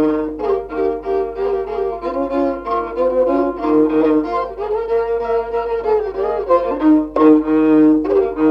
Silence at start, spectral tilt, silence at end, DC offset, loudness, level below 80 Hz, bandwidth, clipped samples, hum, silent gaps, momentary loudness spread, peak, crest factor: 0 s; -8.5 dB/octave; 0 s; under 0.1%; -17 LUFS; -42 dBFS; 5.6 kHz; under 0.1%; none; none; 9 LU; -2 dBFS; 14 dB